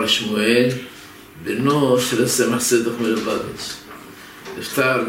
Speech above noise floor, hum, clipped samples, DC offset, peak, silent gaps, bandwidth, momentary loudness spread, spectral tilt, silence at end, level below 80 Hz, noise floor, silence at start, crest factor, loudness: 20 dB; none; under 0.1%; under 0.1%; -4 dBFS; none; 16.5 kHz; 21 LU; -3.5 dB/octave; 0 s; -56 dBFS; -39 dBFS; 0 s; 16 dB; -19 LUFS